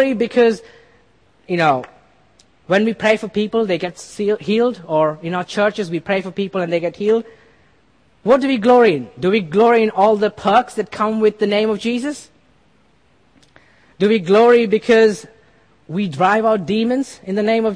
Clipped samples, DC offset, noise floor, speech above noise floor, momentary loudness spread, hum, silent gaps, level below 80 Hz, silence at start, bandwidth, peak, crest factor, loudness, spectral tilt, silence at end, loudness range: under 0.1%; 0.1%; -56 dBFS; 41 dB; 11 LU; none; none; -58 dBFS; 0 s; 10.5 kHz; -2 dBFS; 16 dB; -17 LUFS; -6 dB/octave; 0 s; 5 LU